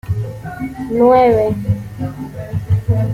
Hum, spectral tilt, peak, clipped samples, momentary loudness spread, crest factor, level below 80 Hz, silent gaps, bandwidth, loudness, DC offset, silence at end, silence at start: none; -9 dB/octave; -2 dBFS; under 0.1%; 16 LU; 14 dB; -38 dBFS; none; 15.5 kHz; -16 LUFS; under 0.1%; 0 s; 0.05 s